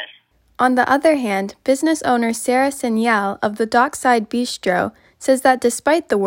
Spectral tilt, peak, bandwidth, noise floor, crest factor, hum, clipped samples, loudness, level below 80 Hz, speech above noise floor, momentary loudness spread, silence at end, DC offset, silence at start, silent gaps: -4 dB/octave; -2 dBFS; 16.5 kHz; -51 dBFS; 16 dB; none; under 0.1%; -18 LUFS; -58 dBFS; 34 dB; 7 LU; 0 s; under 0.1%; 0 s; none